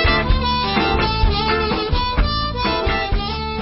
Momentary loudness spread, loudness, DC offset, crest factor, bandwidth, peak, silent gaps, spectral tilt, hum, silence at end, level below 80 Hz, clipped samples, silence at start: 3 LU; -19 LUFS; under 0.1%; 14 dB; 5.8 kHz; -4 dBFS; none; -9 dB/octave; none; 0 s; -22 dBFS; under 0.1%; 0 s